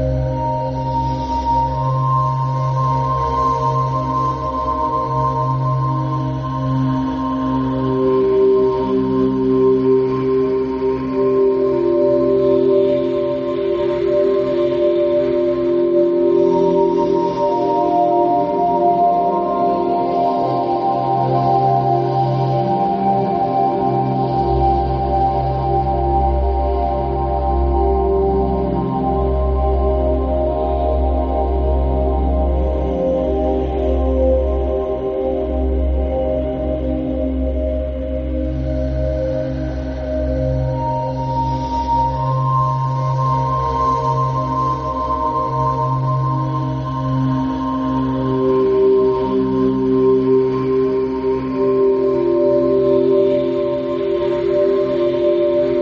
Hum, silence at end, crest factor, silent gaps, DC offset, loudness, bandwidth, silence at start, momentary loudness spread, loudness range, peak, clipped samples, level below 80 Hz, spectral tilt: none; 0 s; 14 dB; none; under 0.1%; -17 LUFS; 6.6 kHz; 0 s; 6 LU; 4 LU; -4 dBFS; under 0.1%; -26 dBFS; -9.5 dB/octave